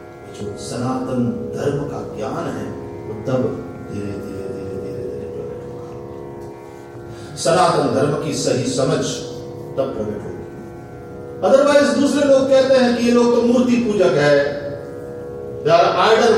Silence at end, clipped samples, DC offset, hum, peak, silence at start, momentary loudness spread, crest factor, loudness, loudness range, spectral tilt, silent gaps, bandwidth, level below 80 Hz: 0 s; under 0.1%; under 0.1%; none; 0 dBFS; 0 s; 19 LU; 18 dB; -18 LUFS; 12 LU; -5 dB/octave; none; 13.5 kHz; -50 dBFS